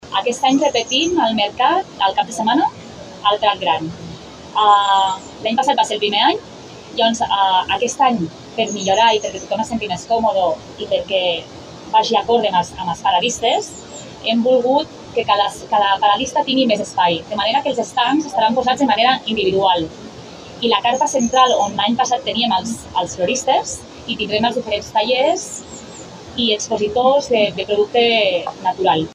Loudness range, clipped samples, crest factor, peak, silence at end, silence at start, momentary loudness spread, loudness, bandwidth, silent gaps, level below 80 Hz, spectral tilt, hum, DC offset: 2 LU; under 0.1%; 18 dB; 0 dBFS; 0 s; 0.05 s; 12 LU; -17 LUFS; 12.5 kHz; none; -52 dBFS; -3 dB/octave; none; under 0.1%